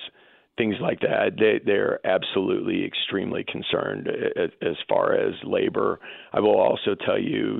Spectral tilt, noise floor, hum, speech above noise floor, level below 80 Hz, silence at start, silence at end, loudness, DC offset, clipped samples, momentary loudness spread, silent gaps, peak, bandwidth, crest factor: -9.5 dB/octave; -56 dBFS; none; 33 dB; -66 dBFS; 0 s; 0 s; -24 LUFS; under 0.1%; under 0.1%; 8 LU; none; -8 dBFS; 4.2 kHz; 16 dB